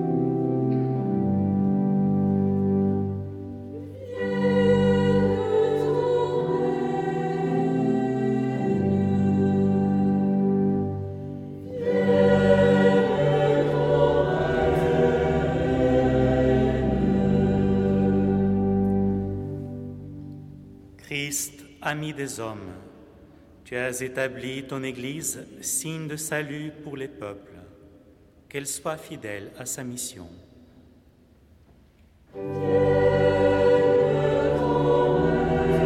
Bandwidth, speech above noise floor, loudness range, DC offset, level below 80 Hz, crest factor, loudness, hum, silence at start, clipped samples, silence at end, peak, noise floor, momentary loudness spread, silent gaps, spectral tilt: 15.5 kHz; 24 dB; 13 LU; under 0.1%; -44 dBFS; 16 dB; -23 LUFS; none; 0 s; under 0.1%; 0 s; -6 dBFS; -56 dBFS; 15 LU; none; -6.5 dB/octave